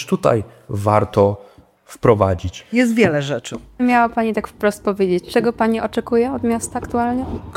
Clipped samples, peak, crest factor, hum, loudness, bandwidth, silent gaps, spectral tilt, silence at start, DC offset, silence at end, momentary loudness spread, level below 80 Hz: under 0.1%; -2 dBFS; 18 dB; none; -18 LUFS; 16 kHz; none; -6.5 dB/octave; 0 s; under 0.1%; 0 s; 8 LU; -44 dBFS